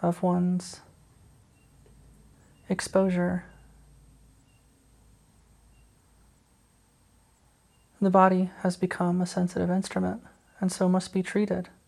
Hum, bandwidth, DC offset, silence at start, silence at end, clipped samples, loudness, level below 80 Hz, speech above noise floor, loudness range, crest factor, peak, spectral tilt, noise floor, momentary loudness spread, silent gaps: none; 12 kHz; under 0.1%; 0 s; 0.2 s; under 0.1%; -27 LUFS; -60 dBFS; 37 dB; 6 LU; 22 dB; -6 dBFS; -6.5 dB/octave; -63 dBFS; 11 LU; none